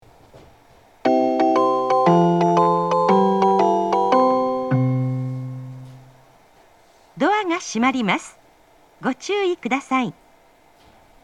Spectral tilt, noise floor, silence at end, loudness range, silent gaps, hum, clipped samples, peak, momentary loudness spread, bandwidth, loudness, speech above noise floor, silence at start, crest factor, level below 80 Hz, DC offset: -6.5 dB/octave; -54 dBFS; 1.15 s; 7 LU; none; none; under 0.1%; -2 dBFS; 12 LU; 11 kHz; -19 LUFS; 32 dB; 1.05 s; 18 dB; -62 dBFS; under 0.1%